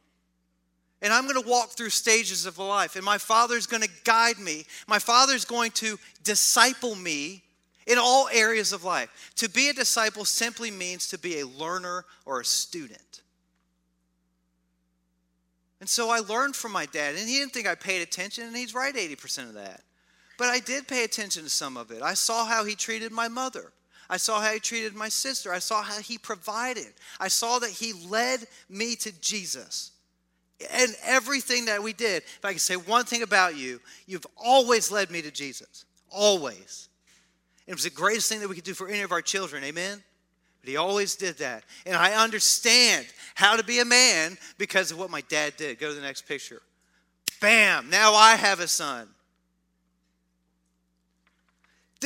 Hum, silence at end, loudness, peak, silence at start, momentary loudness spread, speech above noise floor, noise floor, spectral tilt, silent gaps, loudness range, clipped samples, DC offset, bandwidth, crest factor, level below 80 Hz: none; 0 s; -24 LUFS; -2 dBFS; 1 s; 16 LU; 47 dB; -73 dBFS; -0.5 dB/octave; none; 9 LU; under 0.1%; under 0.1%; 16.5 kHz; 26 dB; -76 dBFS